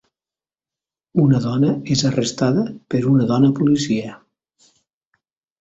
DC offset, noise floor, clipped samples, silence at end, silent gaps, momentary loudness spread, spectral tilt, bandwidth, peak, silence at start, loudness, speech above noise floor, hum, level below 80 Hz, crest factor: under 0.1%; under -90 dBFS; under 0.1%; 1.45 s; none; 7 LU; -6.5 dB/octave; 8 kHz; -4 dBFS; 1.15 s; -18 LUFS; over 73 dB; none; -54 dBFS; 16 dB